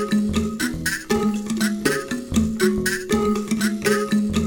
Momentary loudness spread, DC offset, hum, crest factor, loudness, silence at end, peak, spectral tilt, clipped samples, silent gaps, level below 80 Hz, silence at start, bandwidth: 4 LU; under 0.1%; none; 16 dB; -22 LUFS; 0 s; -4 dBFS; -4.5 dB/octave; under 0.1%; none; -40 dBFS; 0 s; 20 kHz